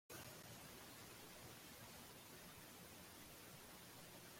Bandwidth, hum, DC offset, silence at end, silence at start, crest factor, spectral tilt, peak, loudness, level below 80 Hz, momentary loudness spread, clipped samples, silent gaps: 16.5 kHz; none; under 0.1%; 0 s; 0.1 s; 16 dB; -3 dB/octave; -44 dBFS; -58 LUFS; -78 dBFS; 2 LU; under 0.1%; none